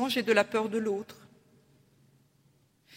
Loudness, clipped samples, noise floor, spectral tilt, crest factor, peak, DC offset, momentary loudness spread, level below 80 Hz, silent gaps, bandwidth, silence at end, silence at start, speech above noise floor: -28 LUFS; under 0.1%; -67 dBFS; -4 dB/octave; 24 dB; -8 dBFS; under 0.1%; 11 LU; -76 dBFS; none; 16 kHz; 1.85 s; 0 s; 38 dB